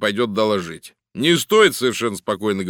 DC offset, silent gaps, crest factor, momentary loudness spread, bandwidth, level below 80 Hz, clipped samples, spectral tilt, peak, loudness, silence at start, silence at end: under 0.1%; none; 18 dB; 17 LU; 18.5 kHz; -62 dBFS; under 0.1%; -4 dB/octave; 0 dBFS; -18 LUFS; 0 s; 0 s